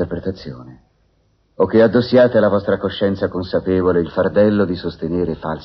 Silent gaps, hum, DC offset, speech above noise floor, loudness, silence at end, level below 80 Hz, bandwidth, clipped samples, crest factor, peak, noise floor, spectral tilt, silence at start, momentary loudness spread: none; none; under 0.1%; 44 dB; -17 LUFS; 0 s; -44 dBFS; 6 kHz; under 0.1%; 14 dB; -2 dBFS; -60 dBFS; -6 dB/octave; 0 s; 12 LU